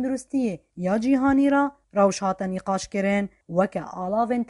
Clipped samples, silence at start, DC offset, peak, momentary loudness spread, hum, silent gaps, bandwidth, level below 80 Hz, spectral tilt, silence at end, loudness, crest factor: under 0.1%; 0 s; under 0.1%; -8 dBFS; 8 LU; none; none; 11.5 kHz; -56 dBFS; -6 dB/octave; 0.05 s; -24 LUFS; 16 dB